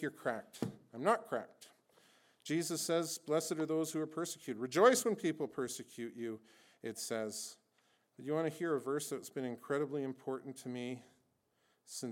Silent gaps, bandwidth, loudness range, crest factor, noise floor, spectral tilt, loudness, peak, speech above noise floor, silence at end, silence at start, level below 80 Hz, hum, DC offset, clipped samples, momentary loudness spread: none; 18 kHz; 8 LU; 24 dB; -78 dBFS; -4 dB/octave; -38 LUFS; -14 dBFS; 40 dB; 0 s; 0 s; -86 dBFS; none; under 0.1%; under 0.1%; 12 LU